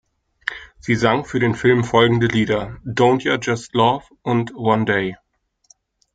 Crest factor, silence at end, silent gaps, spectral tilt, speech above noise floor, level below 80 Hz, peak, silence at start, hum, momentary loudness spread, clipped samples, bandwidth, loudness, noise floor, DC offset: 18 dB; 1 s; none; -6 dB/octave; 39 dB; -50 dBFS; -2 dBFS; 0.45 s; none; 12 LU; under 0.1%; 9.2 kHz; -19 LUFS; -56 dBFS; under 0.1%